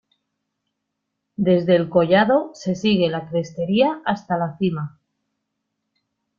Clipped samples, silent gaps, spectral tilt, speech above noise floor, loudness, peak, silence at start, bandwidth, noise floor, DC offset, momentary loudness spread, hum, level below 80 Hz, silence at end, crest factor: under 0.1%; none; -7 dB/octave; 59 dB; -20 LUFS; -4 dBFS; 1.4 s; 7.4 kHz; -78 dBFS; under 0.1%; 10 LU; none; -60 dBFS; 1.5 s; 18 dB